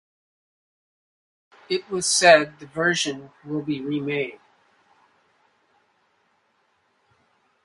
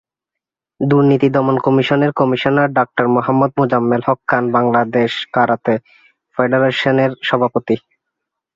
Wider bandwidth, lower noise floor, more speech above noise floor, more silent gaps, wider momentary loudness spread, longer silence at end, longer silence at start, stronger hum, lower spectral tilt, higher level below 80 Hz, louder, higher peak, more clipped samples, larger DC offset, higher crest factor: first, 11.5 kHz vs 7.4 kHz; second, -67 dBFS vs -84 dBFS; second, 45 dB vs 69 dB; neither; first, 16 LU vs 6 LU; first, 3.3 s vs 0.75 s; first, 1.7 s vs 0.8 s; neither; second, -2.5 dB/octave vs -8 dB/octave; second, -68 dBFS vs -56 dBFS; second, -21 LUFS vs -15 LUFS; about the same, 0 dBFS vs 0 dBFS; neither; neither; first, 26 dB vs 14 dB